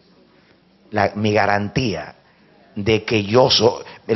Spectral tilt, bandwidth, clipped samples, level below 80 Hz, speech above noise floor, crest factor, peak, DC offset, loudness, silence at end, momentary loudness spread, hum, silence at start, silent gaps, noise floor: -3.5 dB/octave; 6.4 kHz; under 0.1%; -50 dBFS; 36 dB; 18 dB; -2 dBFS; under 0.1%; -18 LUFS; 0 s; 16 LU; none; 0.9 s; none; -54 dBFS